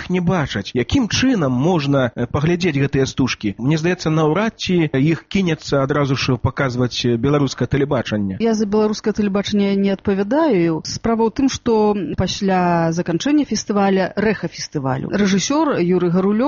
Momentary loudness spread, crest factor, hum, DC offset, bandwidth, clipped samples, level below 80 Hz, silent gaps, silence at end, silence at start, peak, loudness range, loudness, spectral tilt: 4 LU; 12 dB; none; under 0.1%; 7.4 kHz; under 0.1%; -42 dBFS; none; 0 s; 0 s; -6 dBFS; 1 LU; -18 LUFS; -5.5 dB/octave